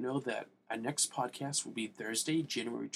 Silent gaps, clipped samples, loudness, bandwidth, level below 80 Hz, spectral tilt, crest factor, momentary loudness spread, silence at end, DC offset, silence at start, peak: none; under 0.1%; -36 LUFS; 16 kHz; -84 dBFS; -3 dB/octave; 20 dB; 8 LU; 0 s; under 0.1%; 0 s; -18 dBFS